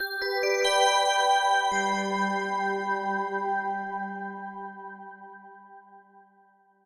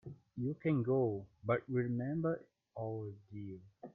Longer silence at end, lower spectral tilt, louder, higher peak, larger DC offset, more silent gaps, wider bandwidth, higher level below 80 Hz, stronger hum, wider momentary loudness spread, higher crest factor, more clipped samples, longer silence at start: first, 0.85 s vs 0.05 s; second, -2.5 dB/octave vs -11.5 dB/octave; first, -26 LUFS vs -38 LUFS; first, -10 dBFS vs -20 dBFS; neither; neither; first, 15.5 kHz vs 3.9 kHz; about the same, -70 dBFS vs -74 dBFS; neither; first, 20 LU vs 16 LU; about the same, 18 dB vs 18 dB; neither; about the same, 0 s vs 0.05 s